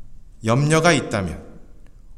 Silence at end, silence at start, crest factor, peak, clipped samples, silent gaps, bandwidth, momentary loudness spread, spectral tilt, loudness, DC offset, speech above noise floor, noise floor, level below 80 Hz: 0 s; 0 s; 20 dB; -2 dBFS; under 0.1%; none; 13.5 kHz; 14 LU; -5 dB/octave; -19 LUFS; under 0.1%; 22 dB; -41 dBFS; -44 dBFS